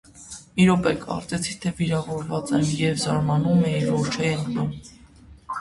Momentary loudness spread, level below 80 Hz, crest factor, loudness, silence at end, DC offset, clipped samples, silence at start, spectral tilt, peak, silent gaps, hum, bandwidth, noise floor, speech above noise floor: 11 LU; -50 dBFS; 16 dB; -23 LUFS; 0 s; under 0.1%; under 0.1%; 0.15 s; -6 dB/octave; -8 dBFS; none; none; 11.5 kHz; -48 dBFS; 26 dB